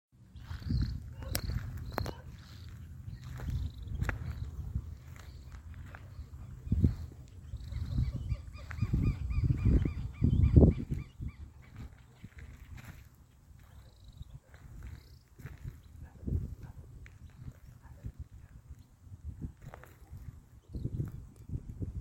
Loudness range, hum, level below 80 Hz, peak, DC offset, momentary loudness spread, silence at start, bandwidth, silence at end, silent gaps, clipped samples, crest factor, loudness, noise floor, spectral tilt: 21 LU; none; -40 dBFS; -8 dBFS; under 0.1%; 22 LU; 0.2 s; 16.5 kHz; 0 s; none; under 0.1%; 28 dB; -35 LUFS; -58 dBFS; -7.5 dB/octave